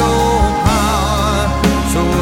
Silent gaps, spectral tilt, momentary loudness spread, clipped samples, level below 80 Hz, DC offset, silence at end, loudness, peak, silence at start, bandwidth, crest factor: none; -5 dB/octave; 2 LU; under 0.1%; -20 dBFS; under 0.1%; 0 s; -14 LUFS; -2 dBFS; 0 s; 17 kHz; 12 dB